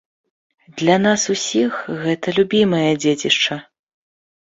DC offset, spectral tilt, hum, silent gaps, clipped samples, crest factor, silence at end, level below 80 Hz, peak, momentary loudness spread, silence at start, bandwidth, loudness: under 0.1%; -4 dB/octave; none; none; under 0.1%; 18 dB; 0.8 s; -60 dBFS; -2 dBFS; 7 LU; 0.75 s; 8.2 kHz; -17 LUFS